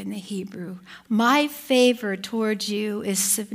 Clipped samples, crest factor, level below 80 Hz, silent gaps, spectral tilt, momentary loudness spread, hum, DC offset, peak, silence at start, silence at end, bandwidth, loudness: under 0.1%; 16 dB; -70 dBFS; none; -3 dB/octave; 16 LU; none; under 0.1%; -6 dBFS; 0 s; 0 s; 16 kHz; -23 LUFS